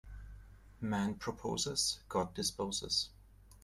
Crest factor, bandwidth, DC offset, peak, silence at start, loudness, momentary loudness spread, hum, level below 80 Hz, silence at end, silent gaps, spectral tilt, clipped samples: 18 dB; 15.5 kHz; under 0.1%; -20 dBFS; 0.05 s; -36 LUFS; 13 LU; none; -56 dBFS; 0.05 s; none; -3 dB/octave; under 0.1%